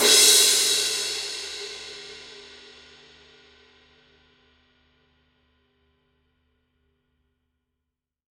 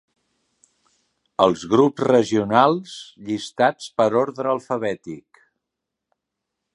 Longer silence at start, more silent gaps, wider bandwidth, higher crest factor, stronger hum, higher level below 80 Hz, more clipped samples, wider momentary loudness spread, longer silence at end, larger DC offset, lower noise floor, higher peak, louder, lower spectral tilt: second, 0 s vs 1.4 s; neither; first, 16.5 kHz vs 11.5 kHz; about the same, 24 dB vs 22 dB; neither; about the same, -66 dBFS vs -62 dBFS; neither; first, 28 LU vs 16 LU; first, 5.95 s vs 1.55 s; neither; about the same, -84 dBFS vs -83 dBFS; second, -4 dBFS vs 0 dBFS; about the same, -18 LUFS vs -20 LUFS; second, 2 dB/octave vs -5.5 dB/octave